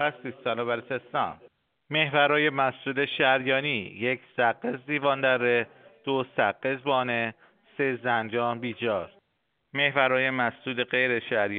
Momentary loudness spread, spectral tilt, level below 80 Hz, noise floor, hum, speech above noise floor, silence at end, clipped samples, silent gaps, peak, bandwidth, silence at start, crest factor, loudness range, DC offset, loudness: 9 LU; -2 dB/octave; -74 dBFS; -75 dBFS; none; 49 dB; 0 s; under 0.1%; none; -6 dBFS; 4.7 kHz; 0 s; 20 dB; 3 LU; under 0.1%; -26 LUFS